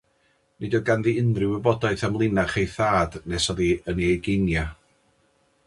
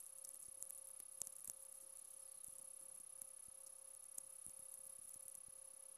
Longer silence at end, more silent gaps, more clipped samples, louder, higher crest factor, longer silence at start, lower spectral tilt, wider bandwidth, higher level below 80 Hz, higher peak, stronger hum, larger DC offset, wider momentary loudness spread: first, 0.95 s vs 0 s; neither; neither; first, -23 LUFS vs -53 LUFS; second, 20 dB vs 34 dB; first, 0.6 s vs 0 s; first, -6 dB/octave vs 0.5 dB/octave; second, 11.5 kHz vs 16 kHz; first, -40 dBFS vs -88 dBFS; first, -4 dBFS vs -24 dBFS; neither; neither; about the same, 5 LU vs 5 LU